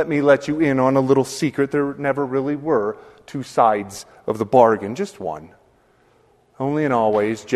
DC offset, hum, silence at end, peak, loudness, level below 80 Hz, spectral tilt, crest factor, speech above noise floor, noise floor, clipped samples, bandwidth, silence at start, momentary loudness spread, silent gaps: under 0.1%; none; 0 s; 0 dBFS; -19 LUFS; -58 dBFS; -6.5 dB/octave; 20 dB; 38 dB; -57 dBFS; under 0.1%; 13.5 kHz; 0 s; 14 LU; none